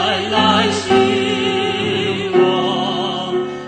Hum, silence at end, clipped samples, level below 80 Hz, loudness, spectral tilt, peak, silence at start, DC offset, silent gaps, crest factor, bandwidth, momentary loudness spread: none; 0 s; under 0.1%; -52 dBFS; -16 LUFS; -4.5 dB/octave; -2 dBFS; 0 s; under 0.1%; none; 16 dB; 9.2 kHz; 6 LU